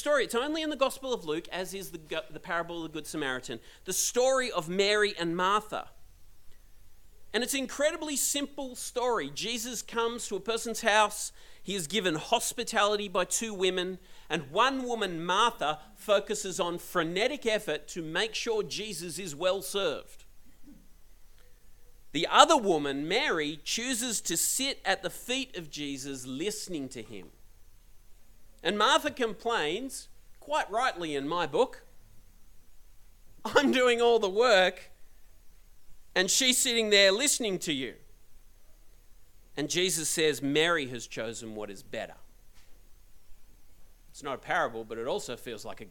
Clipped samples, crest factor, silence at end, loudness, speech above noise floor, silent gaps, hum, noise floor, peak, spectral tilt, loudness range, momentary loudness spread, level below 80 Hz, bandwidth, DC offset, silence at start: under 0.1%; 28 dB; 0 s; -29 LUFS; 23 dB; none; none; -52 dBFS; -2 dBFS; -2 dB/octave; 9 LU; 15 LU; -58 dBFS; 17.5 kHz; under 0.1%; 0 s